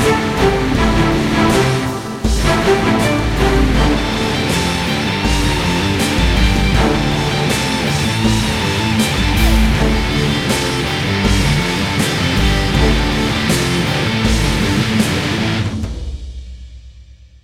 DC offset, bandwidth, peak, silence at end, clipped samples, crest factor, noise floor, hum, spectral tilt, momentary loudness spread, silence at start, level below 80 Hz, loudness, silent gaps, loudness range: under 0.1%; 16 kHz; 0 dBFS; 0.4 s; under 0.1%; 14 dB; -40 dBFS; none; -5 dB/octave; 4 LU; 0 s; -22 dBFS; -15 LUFS; none; 1 LU